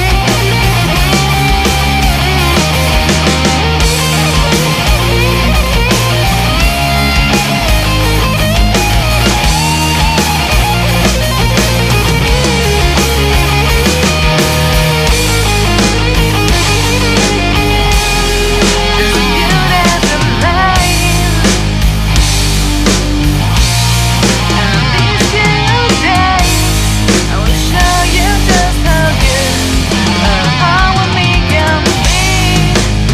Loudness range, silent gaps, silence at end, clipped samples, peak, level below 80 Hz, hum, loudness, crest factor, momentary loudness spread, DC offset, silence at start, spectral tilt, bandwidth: 1 LU; none; 0 s; under 0.1%; 0 dBFS; -16 dBFS; none; -10 LUFS; 10 dB; 2 LU; under 0.1%; 0 s; -4 dB/octave; 16 kHz